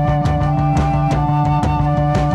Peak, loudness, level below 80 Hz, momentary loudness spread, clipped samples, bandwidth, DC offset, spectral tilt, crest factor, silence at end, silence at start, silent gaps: -4 dBFS; -16 LUFS; -26 dBFS; 1 LU; under 0.1%; 8.6 kHz; under 0.1%; -8 dB/octave; 12 dB; 0 s; 0 s; none